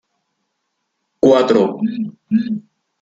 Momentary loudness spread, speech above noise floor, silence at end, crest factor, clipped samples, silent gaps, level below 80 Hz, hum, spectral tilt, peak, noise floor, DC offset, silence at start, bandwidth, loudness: 13 LU; 57 dB; 0.4 s; 16 dB; under 0.1%; none; -60 dBFS; none; -7 dB/octave; -2 dBFS; -73 dBFS; under 0.1%; 1.25 s; 7.8 kHz; -16 LUFS